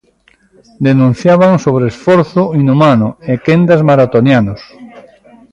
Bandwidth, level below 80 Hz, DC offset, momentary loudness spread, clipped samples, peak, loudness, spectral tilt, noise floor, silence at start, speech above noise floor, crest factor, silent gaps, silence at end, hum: 9.6 kHz; -44 dBFS; under 0.1%; 7 LU; under 0.1%; 0 dBFS; -10 LUFS; -8 dB/octave; -51 dBFS; 0.8 s; 42 dB; 10 dB; none; 0.55 s; none